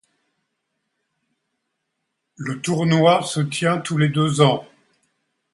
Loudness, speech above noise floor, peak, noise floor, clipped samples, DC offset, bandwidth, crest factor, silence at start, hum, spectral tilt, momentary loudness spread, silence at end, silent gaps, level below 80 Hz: -19 LUFS; 58 dB; -2 dBFS; -77 dBFS; under 0.1%; under 0.1%; 11.5 kHz; 20 dB; 2.4 s; none; -5.5 dB/octave; 11 LU; 0.9 s; none; -62 dBFS